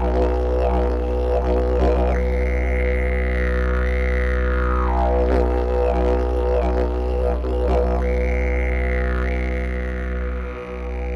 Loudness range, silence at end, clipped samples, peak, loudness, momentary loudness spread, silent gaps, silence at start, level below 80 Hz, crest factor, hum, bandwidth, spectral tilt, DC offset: 2 LU; 0 s; under 0.1%; -6 dBFS; -21 LUFS; 6 LU; none; 0 s; -22 dBFS; 14 dB; none; 5.8 kHz; -8.5 dB/octave; under 0.1%